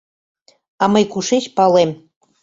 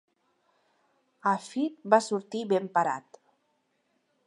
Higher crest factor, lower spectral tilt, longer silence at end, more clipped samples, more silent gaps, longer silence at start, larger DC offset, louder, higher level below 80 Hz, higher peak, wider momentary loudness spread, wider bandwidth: second, 16 dB vs 24 dB; about the same, -5 dB/octave vs -5 dB/octave; second, 0.5 s vs 1.25 s; neither; neither; second, 0.8 s vs 1.25 s; neither; first, -16 LUFS vs -28 LUFS; first, -60 dBFS vs -86 dBFS; first, -2 dBFS vs -6 dBFS; about the same, 7 LU vs 8 LU; second, 7.8 kHz vs 11.5 kHz